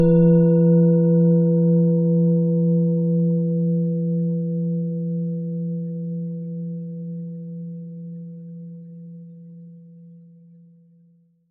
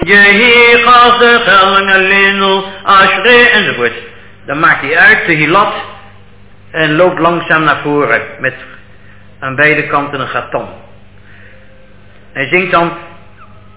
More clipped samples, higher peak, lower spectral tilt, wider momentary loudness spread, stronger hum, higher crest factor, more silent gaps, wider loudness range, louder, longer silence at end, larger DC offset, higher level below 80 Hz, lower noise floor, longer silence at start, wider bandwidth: second, under 0.1% vs 2%; second, -6 dBFS vs 0 dBFS; first, -15.5 dB/octave vs -7.5 dB/octave; first, 22 LU vs 16 LU; second, none vs 50 Hz at -45 dBFS; about the same, 14 dB vs 10 dB; neither; first, 21 LU vs 10 LU; second, -20 LUFS vs -7 LUFS; first, 1.35 s vs 0.7 s; second, under 0.1% vs 1%; second, -52 dBFS vs -42 dBFS; first, -57 dBFS vs -40 dBFS; about the same, 0 s vs 0 s; second, 1.6 kHz vs 4 kHz